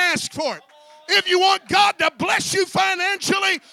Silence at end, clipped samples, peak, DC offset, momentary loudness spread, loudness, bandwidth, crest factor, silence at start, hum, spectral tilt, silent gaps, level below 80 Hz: 0.15 s; under 0.1%; -4 dBFS; under 0.1%; 9 LU; -18 LUFS; 16.5 kHz; 16 dB; 0 s; none; -2 dB/octave; none; -60 dBFS